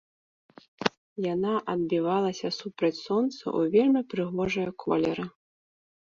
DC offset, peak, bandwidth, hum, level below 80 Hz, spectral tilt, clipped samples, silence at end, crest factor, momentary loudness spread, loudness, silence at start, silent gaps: under 0.1%; -2 dBFS; 7.6 kHz; none; -64 dBFS; -6 dB/octave; under 0.1%; 0.8 s; 26 dB; 8 LU; -28 LUFS; 0.8 s; 0.97-1.16 s